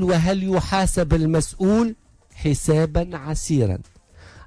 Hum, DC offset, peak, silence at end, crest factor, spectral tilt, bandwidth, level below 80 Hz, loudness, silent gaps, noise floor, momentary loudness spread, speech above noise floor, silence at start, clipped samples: none; under 0.1%; -6 dBFS; 0.05 s; 14 dB; -6 dB/octave; 11 kHz; -32 dBFS; -21 LUFS; none; -46 dBFS; 8 LU; 26 dB; 0 s; under 0.1%